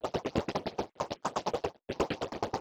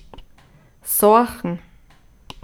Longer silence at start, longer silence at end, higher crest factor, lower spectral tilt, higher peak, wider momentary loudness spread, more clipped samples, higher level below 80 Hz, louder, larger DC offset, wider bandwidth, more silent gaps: second, 0.05 s vs 0.85 s; second, 0 s vs 0.85 s; about the same, 20 dB vs 20 dB; about the same, -5 dB/octave vs -4.5 dB/octave; second, -16 dBFS vs -2 dBFS; second, 4 LU vs 19 LU; neither; second, -54 dBFS vs -48 dBFS; second, -35 LUFS vs -17 LUFS; neither; about the same, over 20 kHz vs over 20 kHz; neither